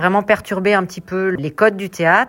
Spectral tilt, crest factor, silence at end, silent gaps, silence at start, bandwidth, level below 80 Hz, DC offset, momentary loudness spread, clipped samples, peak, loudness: -6 dB/octave; 16 dB; 0 s; none; 0 s; 16.5 kHz; -54 dBFS; under 0.1%; 6 LU; under 0.1%; 0 dBFS; -17 LUFS